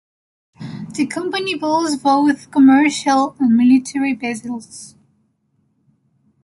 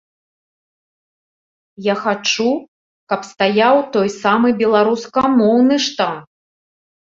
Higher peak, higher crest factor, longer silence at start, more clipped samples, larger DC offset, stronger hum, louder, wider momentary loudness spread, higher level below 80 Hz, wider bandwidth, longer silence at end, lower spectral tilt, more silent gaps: about the same, -2 dBFS vs -2 dBFS; about the same, 16 dB vs 16 dB; second, 0.6 s vs 1.8 s; neither; neither; neither; about the same, -16 LUFS vs -16 LUFS; first, 19 LU vs 11 LU; about the same, -62 dBFS vs -60 dBFS; first, 11.5 kHz vs 7.6 kHz; first, 1.55 s vs 0.9 s; about the same, -4.5 dB/octave vs -4.5 dB/octave; second, none vs 2.68-3.07 s